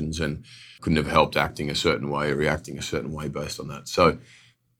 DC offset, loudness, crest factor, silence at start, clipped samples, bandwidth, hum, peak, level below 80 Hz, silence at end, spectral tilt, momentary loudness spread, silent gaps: under 0.1%; -25 LUFS; 24 dB; 0 s; under 0.1%; 17.5 kHz; none; -2 dBFS; -44 dBFS; 0.6 s; -5 dB/octave; 12 LU; none